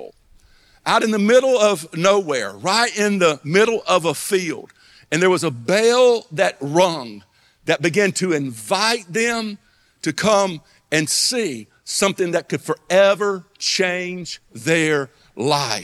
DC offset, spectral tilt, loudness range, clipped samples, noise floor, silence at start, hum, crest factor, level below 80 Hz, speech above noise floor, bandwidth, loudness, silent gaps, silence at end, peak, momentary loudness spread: under 0.1%; -3.5 dB/octave; 3 LU; under 0.1%; -52 dBFS; 0 s; none; 18 dB; -62 dBFS; 34 dB; 15.5 kHz; -18 LUFS; none; 0 s; -2 dBFS; 12 LU